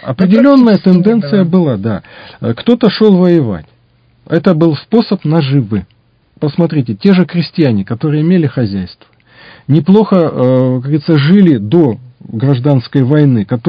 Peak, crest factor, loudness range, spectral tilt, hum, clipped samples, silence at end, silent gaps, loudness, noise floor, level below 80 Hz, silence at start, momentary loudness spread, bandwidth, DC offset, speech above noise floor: 0 dBFS; 10 dB; 3 LU; -10 dB/octave; none; 1%; 0 s; none; -11 LUFS; -50 dBFS; -44 dBFS; 0.05 s; 11 LU; 5.2 kHz; under 0.1%; 40 dB